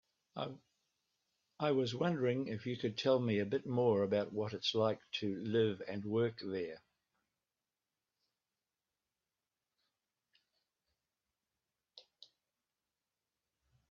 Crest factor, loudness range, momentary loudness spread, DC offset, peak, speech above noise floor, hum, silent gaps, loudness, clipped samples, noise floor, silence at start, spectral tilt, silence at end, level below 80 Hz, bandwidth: 20 dB; 9 LU; 12 LU; under 0.1%; -20 dBFS; over 54 dB; none; none; -37 LUFS; under 0.1%; under -90 dBFS; 0.35 s; -6.5 dB/octave; 1.9 s; -80 dBFS; 7.4 kHz